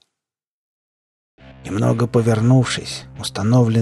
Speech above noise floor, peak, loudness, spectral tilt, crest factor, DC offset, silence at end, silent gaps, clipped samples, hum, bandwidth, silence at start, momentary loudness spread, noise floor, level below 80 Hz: 70 dB; -4 dBFS; -18 LUFS; -6.5 dB/octave; 14 dB; under 0.1%; 0 s; none; under 0.1%; none; 12 kHz; 1.45 s; 12 LU; -86 dBFS; -50 dBFS